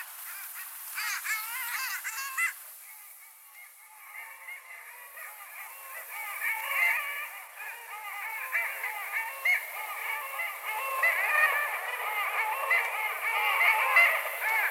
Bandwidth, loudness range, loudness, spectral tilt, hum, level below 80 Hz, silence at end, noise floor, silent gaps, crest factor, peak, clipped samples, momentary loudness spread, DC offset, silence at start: 18 kHz; 13 LU; -28 LUFS; 7 dB/octave; none; under -90 dBFS; 0 s; -51 dBFS; none; 22 dB; -10 dBFS; under 0.1%; 20 LU; under 0.1%; 0 s